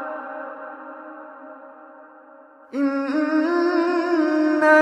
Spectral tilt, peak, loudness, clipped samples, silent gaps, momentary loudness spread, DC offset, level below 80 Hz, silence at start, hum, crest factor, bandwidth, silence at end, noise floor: -4 dB/octave; -2 dBFS; -21 LUFS; under 0.1%; none; 21 LU; under 0.1%; -82 dBFS; 0 s; none; 20 dB; 9.8 kHz; 0 s; -48 dBFS